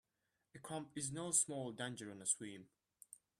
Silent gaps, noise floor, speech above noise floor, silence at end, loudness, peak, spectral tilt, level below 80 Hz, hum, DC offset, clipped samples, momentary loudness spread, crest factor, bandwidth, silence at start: none; -87 dBFS; 44 dB; 0.25 s; -41 LUFS; -22 dBFS; -2.5 dB/octave; -82 dBFS; none; under 0.1%; under 0.1%; 22 LU; 24 dB; 15 kHz; 0.55 s